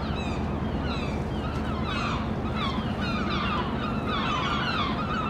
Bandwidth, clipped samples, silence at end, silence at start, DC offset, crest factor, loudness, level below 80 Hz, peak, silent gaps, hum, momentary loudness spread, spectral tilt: 11 kHz; under 0.1%; 0 s; 0 s; under 0.1%; 14 dB; -28 LUFS; -38 dBFS; -14 dBFS; none; none; 4 LU; -6.5 dB/octave